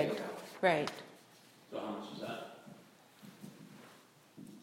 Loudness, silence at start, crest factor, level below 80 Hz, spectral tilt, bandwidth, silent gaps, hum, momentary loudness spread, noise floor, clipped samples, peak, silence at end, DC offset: -38 LUFS; 0 s; 24 dB; -84 dBFS; -5 dB/octave; 16.5 kHz; none; none; 27 LU; -62 dBFS; under 0.1%; -16 dBFS; 0 s; under 0.1%